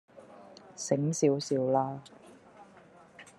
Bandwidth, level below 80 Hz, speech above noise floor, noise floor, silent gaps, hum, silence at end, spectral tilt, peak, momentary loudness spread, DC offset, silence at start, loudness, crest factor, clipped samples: 12.5 kHz; -80 dBFS; 27 dB; -56 dBFS; none; none; 0.15 s; -5.5 dB/octave; -12 dBFS; 24 LU; under 0.1%; 0.15 s; -30 LUFS; 22 dB; under 0.1%